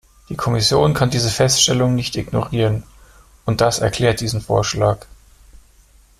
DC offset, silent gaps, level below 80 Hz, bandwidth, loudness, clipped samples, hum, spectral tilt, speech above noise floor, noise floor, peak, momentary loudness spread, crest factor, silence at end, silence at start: under 0.1%; none; -40 dBFS; 14.5 kHz; -17 LUFS; under 0.1%; none; -4.5 dB/octave; 33 dB; -50 dBFS; -2 dBFS; 10 LU; 16 dB; 1.2 s; 0.3 s